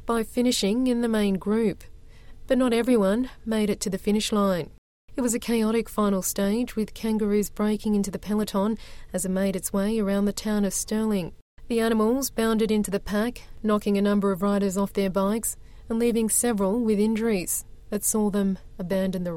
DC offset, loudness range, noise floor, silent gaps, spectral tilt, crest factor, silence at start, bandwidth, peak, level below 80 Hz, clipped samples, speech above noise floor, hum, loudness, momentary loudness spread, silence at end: under 0.1%; 2 LU; -44 dBFS; 4.78-5.08 s, 11.41-11.57 s; -5 dB/octave; 16 dB; 0 s; 17 kHz; -8 dBFS; -46 dBFS; under 0.1%; 20 dB; none; -25 LUFS; 7 LU; 0 s